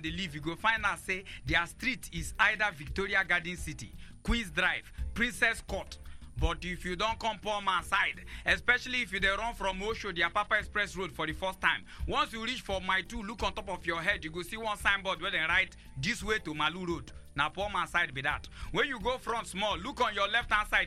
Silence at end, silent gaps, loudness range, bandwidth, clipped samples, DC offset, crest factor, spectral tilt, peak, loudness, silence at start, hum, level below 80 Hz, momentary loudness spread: 0 s; none; 3 LU; 15.5 kHz; under 0.1%; under 0.1%; 22 dB; -3.5 dB/octave; -10 dBFS; -31 LUFS; 0 s; none; -46 dBFS; 9 LU